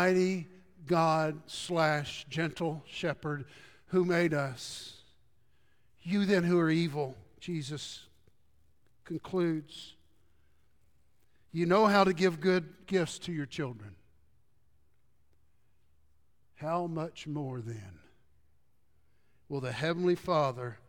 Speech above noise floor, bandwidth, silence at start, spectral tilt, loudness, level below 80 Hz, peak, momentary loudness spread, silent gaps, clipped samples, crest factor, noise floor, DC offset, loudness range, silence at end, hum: 43 dB; 16.5 kHz; 0 s; -6 dB/octave; -31 LUFS; -68 dBFS; -12 dBFS; 16 LU; none; under 0.1%; 22 dB; -74 dBFS; under 0.1%; 10 LU; 0.1 s; none